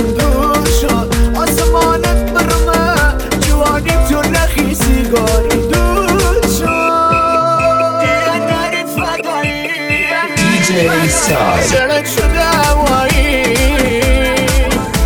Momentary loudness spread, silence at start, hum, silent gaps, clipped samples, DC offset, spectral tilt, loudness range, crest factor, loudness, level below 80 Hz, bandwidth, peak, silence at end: 4 LU; 0 s; none; none; under 0.1%; under 0.1%; -4.5 dB/octave; 2 LU; 12 dB; -12 LUFS; -18 dBFS; 18.5 kHz; 0 dBFS; 0 s